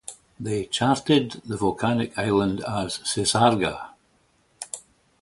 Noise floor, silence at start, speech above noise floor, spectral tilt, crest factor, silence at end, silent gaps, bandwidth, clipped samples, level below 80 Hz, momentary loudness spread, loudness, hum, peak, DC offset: -64 dBFS; 0.1 s; 41 dB; -4.5 dB/octave; 20 dB; 0.4 s; none; 11.5 kHz; under 0.1%; -52 dBFS; 17 LU; -23 LUFS; none; -6 dBFS; under 0.1%